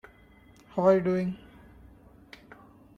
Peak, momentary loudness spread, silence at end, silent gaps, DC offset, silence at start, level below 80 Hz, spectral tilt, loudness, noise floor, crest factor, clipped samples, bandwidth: -10 dBFS; 26 LU; 1.6 s; none; under 0.1%; 0.75 s; -60 dBFS; -8.5 dB/octave; -26 LUFS; -56 dBFS; 22 dB; under 0.1%; 7.2 kHz